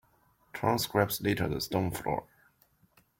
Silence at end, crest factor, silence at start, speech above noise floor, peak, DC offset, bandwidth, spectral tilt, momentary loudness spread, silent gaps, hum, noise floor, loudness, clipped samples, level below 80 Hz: 0.95 s; 20 dB; 0.55 s; 37 dB; -12 dBFS; under 0.1%; 16.5 kHz; -5 dB/octave; 7 LU; none; none; -67 dBFS; -31 LUFS; under 0.1%; -56 dBFS